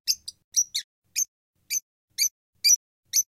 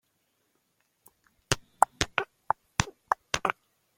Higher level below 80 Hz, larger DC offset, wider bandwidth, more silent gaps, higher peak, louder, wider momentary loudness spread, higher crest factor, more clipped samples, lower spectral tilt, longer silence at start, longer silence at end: second, -78 dBFS vs -52 dBFS; neither; about the same, 16.5 kHz vs 16.5 kHz; first, 0.44-0.52 s, 0.84-1.02 s, 1.28-1.54 s, 1.82-2.08 s, 2.31-2.53 s, 2.76-3.03 s vs none; second, -8 dBFS vs -2 dBFS; first, -25 LUFS vs -30 LUFS; first, 11 LU vs 7 LU; second, 20 dB vs 32 dB; neither; second, 6.5 dB/octave vs -2.5 dB/octave; second, 0.05 s vs 1.5 s; second, 0.05 s vs 0.45 s